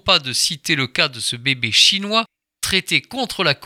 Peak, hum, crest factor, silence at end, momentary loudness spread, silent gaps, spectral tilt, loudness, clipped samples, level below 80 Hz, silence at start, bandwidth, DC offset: 0 dBFS; none; 20 dB; 0 s; 8 LU; none; -2 dB/octave; -17 LUFS; under 0.1%; -50 dBFS; 0.05 s; 18.5 kHz; under 0.1%